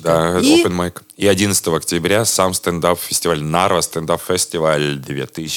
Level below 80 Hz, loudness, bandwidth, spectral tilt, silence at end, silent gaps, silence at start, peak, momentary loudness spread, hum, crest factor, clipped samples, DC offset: -50 dBFS; -16 LUFS; 19.5 kHz; -3.5 dB/octave; 0 s; none; 0 s; 0 dBFS; 8 LU; none; 16 dB; under 0.1%; under 0.1%